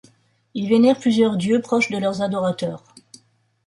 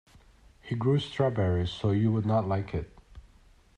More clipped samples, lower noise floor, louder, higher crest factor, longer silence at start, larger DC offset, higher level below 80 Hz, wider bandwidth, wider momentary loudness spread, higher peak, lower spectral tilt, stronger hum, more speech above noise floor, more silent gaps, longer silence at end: neither; about the same, -58 dBFS vs -58 dBFS; first, -20 LUFS vs -28 LUFS; about the same, 16 dB vs 16 dB; about the same, 0.55 s vs 0.65 s; neither; second, -64 dBFS vs -52 dBFS; first, 11.5 kHz vs 9 kHz; first, 13 LU vs 10 LU; first, -4 dBFS vs -12 dBFS; second, -6 dB/octave vs -8 dB/octave; neither; first, 39 dB vs 31 dB; neither; first, 0.9 s vs 0.6 s